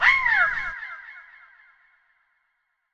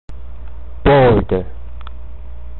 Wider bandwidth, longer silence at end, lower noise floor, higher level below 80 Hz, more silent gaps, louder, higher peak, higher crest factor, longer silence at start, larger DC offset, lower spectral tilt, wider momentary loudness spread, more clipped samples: first, 8.4 kHz vs 4.3 kHz; first, 1.7 s vs 0 s; first, -74 dBFS vs -32 dBFS; second, -56 dBFS vs -28 dBFS; neither; second, -21 LUFS vs -14 LUFS; about the same, -4 dBFS vs -4 dBFS; first, 22 dB vs 14 dB; about the same, 0 s vs 0.1 s; second, under 0.1% vs 5%; second, -1 dB/octave vs -10.5 dB/octave; about the same, 25 LU vs 25 LU; neither